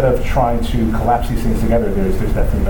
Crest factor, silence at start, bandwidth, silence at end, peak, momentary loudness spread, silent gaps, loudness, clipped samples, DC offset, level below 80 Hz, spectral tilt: 12 dB; 0 s; 19.5 kHz; 0 s; -2 dBFS; 3 LU; none; -17 LUFS; under 0.1%; under 0.1%; -18 dBFS; -7.5 dB/octave